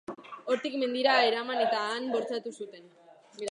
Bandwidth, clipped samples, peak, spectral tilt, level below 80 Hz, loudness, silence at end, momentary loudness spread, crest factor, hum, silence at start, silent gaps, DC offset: 11 kHz; under 0.1%; -10 dBFS; -3 dB/octave; -84 dBFS; -28 LUFS; 0 s; 18 LU; 20 dB; none; 0.1 s; none; under 0.1%